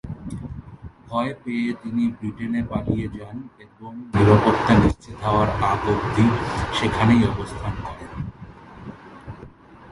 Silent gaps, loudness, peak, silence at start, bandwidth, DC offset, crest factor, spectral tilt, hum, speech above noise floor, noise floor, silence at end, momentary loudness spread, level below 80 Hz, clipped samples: none; -21 LUFS; -2 dBFS; 0.05 s; 11.5 kHz; under 0.1%; 20 dB; -7 dB/octave; none; 23 dB; -44 dBFS; 0 s; 23 LU; -38 dBFS; under 0.1%